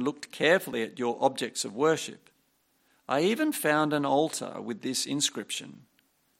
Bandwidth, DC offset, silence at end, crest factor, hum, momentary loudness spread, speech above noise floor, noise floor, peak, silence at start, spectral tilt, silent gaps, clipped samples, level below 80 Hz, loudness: 16.5 kHz; under 0.1%; 0.6 s; 20 dB; none; 11 LU; 42 dB; -71 dBFS; -10 dBFS; 0 s; -3.5 dB/octave; none; under 0.1%; -78 dBFS; -28 LUFS